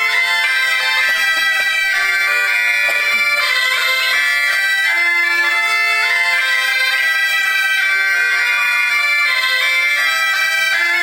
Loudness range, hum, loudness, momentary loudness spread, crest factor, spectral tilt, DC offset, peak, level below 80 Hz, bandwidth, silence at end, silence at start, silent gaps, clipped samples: 0 LU; none; -13 LUFS; 1 LU; 14 dB; 2.5 dB/octave; under 0.1%; -2 dBFS; -60 dBFS; 17.5 kHz; 0 s; 0 s; none; under 0.1%